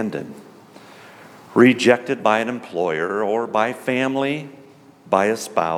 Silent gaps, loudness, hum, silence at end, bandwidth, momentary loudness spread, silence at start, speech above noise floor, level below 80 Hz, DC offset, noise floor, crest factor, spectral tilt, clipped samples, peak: none; -20 LUFS; none; 0 s; 15 kHz; 12 LU; 0 s; 27 dB; -70 dBFS; under 0.1%; -46 dBFS; 20 dB; -5 dB/octave; under 0.1%; 0 dBFS